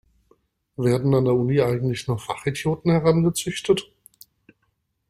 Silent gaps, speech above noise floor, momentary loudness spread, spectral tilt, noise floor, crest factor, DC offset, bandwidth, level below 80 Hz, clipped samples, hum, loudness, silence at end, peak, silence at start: none; 51 dB; 8 LU; -6.5 dB/octave; -72 dBFS; 18 dB; under 0.1%; 15 kHz; -52 dBFS; under 0.1%; none; -22 LUFS; 1.25 s; -6 dBFS; 0.8 s